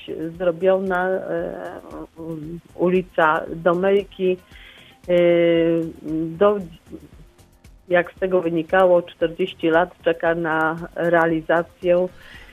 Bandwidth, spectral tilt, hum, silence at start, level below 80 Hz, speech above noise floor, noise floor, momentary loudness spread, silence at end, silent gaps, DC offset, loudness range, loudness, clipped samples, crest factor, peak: 11 kHz; -7.5 dB/octave; none; 0 s; -52 dBFS; 29 dB; -49 dBFS; 15 LU; 0.05 s; none; under 0.1%; 3 LU; -20 LUFS; under 0.1%; 18 dB; -2 dBFS